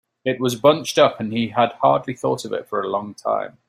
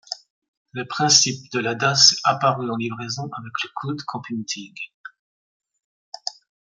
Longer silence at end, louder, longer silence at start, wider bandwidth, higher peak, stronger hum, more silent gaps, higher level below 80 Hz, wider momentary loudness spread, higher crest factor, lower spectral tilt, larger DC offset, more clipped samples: second, 0.2 s vs 0.4 s; about the same, -20 LUFS vs -20 LUFS; first, 0.25 s vs 0.1 s; first, 15 kHz vs 11.5 kHz; about the same, -2 dBFS vs 0 dBFS; neither; second, none vs 0.30-0.42 s, 0.48-0.66 s, 4.94-5.04 s, 5.19-5.60 s, 5.84-6.12 s; first, -62 dBFS vs -68 dBFS; second, 9 LU vs 21 LU; second, 18 dB vs 24 dB; first, -5 dB/octave vs -2 dB/octave; neither; neither